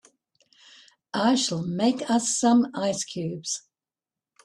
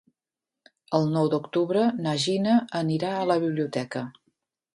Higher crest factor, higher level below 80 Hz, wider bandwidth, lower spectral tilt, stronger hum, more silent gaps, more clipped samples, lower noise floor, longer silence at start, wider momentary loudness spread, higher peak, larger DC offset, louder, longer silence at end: about the same, 18 dB vs 20 dB; about the same, -68 dBFS vs -70 dBFS; about the same, 12 kHz vs 11.5 kHz; second, -4 dB/octave vs -6 dB/octave; neither; neither; neither; about the same, under -90 dBFS vs -89 dBFS; first, 1.15 s vs 0.9 s; first, 11 LU vs 7 LU; second, -10 dBFS vs -6 dBFS; neither; about the same, -25 LUFS vs -25 LUFS; first, 0.85 s vs 0.65 s